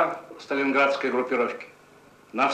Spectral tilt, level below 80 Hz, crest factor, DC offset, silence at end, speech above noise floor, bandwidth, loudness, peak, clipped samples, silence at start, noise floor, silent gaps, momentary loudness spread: -4.5 dB/octave; -76 dBFS; 16 dB; under 0.1%; 0 s; 28 dB; 9.8 kHz; -25 LUFS; -10 dBFS; under 0.1%; 0 s; -53 dBFS; none; 17 LU